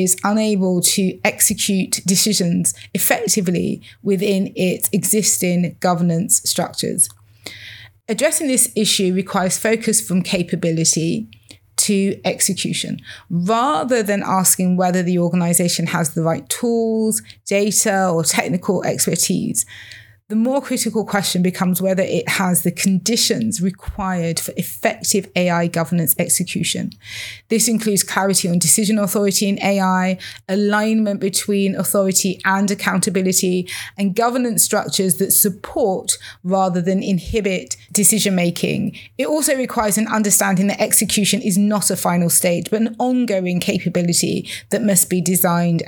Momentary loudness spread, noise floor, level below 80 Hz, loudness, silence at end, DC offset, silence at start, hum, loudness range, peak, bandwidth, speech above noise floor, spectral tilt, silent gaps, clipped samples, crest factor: 8 LU; -39 dBFS; -50 dBFS; -17 LUFS; 0 s; under 0.1%; 0 s; none; 2 LU; 0 dBFS; over 20 kHz; 21 dB; -3.5 dB/octave; none; under 0.1%; 18 dB